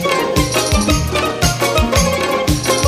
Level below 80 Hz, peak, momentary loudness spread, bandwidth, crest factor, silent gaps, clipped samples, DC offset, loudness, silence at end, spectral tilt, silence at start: -24 dBFS; 0 dBFS; 2 LU; 15.5 kHz; 14 dB; none; under 0.1%; under 0.1%; -15 LUFS; 0 s; -4 dB/octave; 0 s